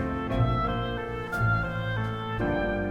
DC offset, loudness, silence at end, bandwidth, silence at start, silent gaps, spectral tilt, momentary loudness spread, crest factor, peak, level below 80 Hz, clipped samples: under 0.1%; -28 LUFS; 0 s; 15.5 kHz; 0 s; none; -8 dB/octave; 5 LU; 16 dB; -12 dBFS; -38 dBFS; under 0.1%